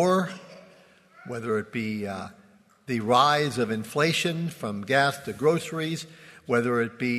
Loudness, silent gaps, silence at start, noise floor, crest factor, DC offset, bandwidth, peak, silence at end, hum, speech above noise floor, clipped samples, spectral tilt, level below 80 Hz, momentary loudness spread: -26 LUFS; none; 0 s; -55 dBFS; 20 dB; under 0.1%; 13.5 kHz; -6 dBFS; 0 s; none; 30 dB; under 0.1%; -5 dB/octave; -68 dBFS; 14 LU